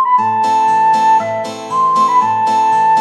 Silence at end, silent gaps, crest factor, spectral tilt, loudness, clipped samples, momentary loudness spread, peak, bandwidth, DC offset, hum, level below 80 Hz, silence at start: 0 s; none; 8 dB; -4 dB/octave; -12 LUFS; under 0.1%; 6 LU; -4 dBFS; 11.5 kHz; under 0.1%; none; -68 dBFS; 0 s